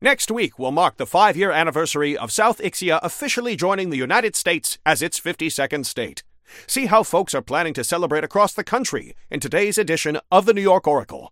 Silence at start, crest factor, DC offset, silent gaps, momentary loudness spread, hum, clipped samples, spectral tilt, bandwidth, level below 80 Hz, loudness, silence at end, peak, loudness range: 0 s; 20 dB; under 0.1%; none; 7 LU; none; under 0.1%; -3 dB/octave; 17 kHz; -58 dBFS; -20 LUFS; 0.05 s; 0 dBFS; 2 LU